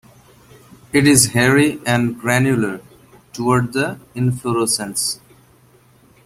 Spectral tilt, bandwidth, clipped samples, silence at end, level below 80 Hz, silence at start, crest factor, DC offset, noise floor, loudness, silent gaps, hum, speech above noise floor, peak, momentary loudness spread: -4 dB/octave; 16 kHz; under 0.1%; 1.1 s; -50 dBFS; 0.95 s; 18 dB; under 0.1%; -51 dBFS; -17 LUFS; none; none; 35 dB; 0 dBFS; 12 LU